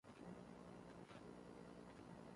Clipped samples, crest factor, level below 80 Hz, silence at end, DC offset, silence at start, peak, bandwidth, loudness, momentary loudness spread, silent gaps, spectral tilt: under 0.1%; 14 dB; -76 dBFS; 0 s; under 0.1%; 0.05 s; -44 dBFS; 11.5 kHz; -60 LUFS; 1 LU; none; -6.5 dB/octave